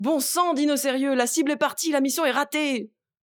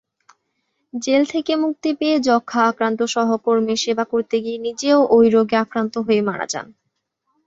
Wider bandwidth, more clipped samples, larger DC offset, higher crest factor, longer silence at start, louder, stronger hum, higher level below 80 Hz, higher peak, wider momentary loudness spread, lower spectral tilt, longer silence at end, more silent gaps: first, over 20 kHz vs 8 kHz; neither; neither; about the same, 16 dB vs 16 dB; second, 0 s vs 0.95 s; second, -23 LUFS vs -19 LUFS; neither; second, -82 dBFS vs -62 dBFS; second, -6 dBFS vs -2 dBFS; second, 4 LU vs 9 LU; second, -2 dB/octave vs -4 dB/octave; second, 0.4 s vs 0.8 s; neither